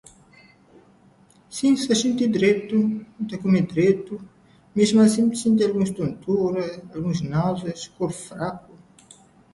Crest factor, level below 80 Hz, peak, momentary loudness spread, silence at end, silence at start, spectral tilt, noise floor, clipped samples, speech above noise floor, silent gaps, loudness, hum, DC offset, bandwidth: 16 dB; -58 dBFS; -6 dBFS; 13 LU; 0.95 s; 1.5 s; -6 dB/octave; -55 dBFS; under 0.1%; 34 dB; none; -22 LUFS; none; under 0.1%; 11.5 kHz